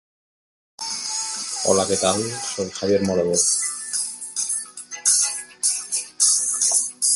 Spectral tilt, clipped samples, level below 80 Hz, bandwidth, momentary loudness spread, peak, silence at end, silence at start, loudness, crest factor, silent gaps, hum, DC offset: -2 dB/octave; under 0.1%; -56 dBFS; 12 kHz; 9 LU; -4 dBFS; 0 s; 0.8 s; -20 LUFS; 20 dB; none; none; under 0.1%